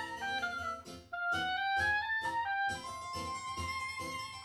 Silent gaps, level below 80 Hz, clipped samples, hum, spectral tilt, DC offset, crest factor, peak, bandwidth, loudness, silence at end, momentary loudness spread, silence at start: none; -62 dBFS; under 0.1%; none; -2.5 dB/octave; under 0.1%; 14 dB; -22 dBFS; over 20 kHz; -36 LUFS; 0 s; 10 LU; 0 s